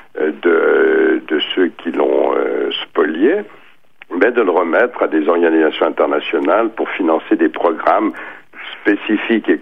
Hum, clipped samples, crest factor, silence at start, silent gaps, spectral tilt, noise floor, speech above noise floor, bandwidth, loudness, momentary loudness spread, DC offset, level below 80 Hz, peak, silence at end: none; under 0.1%; 14 dB; 0.15 s; none; -6.5 dB/octave; -45 dBFS; 31 dB; 4.9 kHz; -15 LUFS; 8 LU; 0.6%; -66 dBFS; 0 dBFS; 0 s